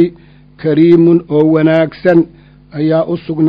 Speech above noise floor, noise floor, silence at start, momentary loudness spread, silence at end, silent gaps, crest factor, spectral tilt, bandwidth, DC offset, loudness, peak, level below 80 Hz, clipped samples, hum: 30 dB; -40 dBFS; 0 s; 11 LU; 0 s; none; 12 dB; -10 dB/octave; 5.2 kHz; under 0.1%; -11 LUFS; 0 dBFS; -48 dBFS; 0.4%; 50 Hz at -40 dBFS